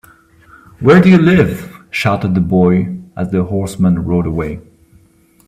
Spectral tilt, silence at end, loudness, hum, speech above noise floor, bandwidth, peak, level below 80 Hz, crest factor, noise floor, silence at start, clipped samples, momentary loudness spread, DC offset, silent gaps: -8 dB/octave; 0.9 s; -13 LUFS; none; 38 dB; 13.5 kHz; 0 dBFS; -40 dBFS; 14 dB; -50 dBFS; 0.8 s; under 0.1%; 15 LU; under 0.1%; none